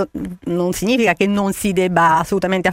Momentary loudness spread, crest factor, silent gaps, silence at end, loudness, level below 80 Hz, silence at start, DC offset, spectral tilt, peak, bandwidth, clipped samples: 8 LU; 16 dB; none; 0 s; -17 LUFS; -44 dBFS; 0 s; under 0.1%; -5 dB/octave; 0 dBFS; 16.5 kHz; under 0.1%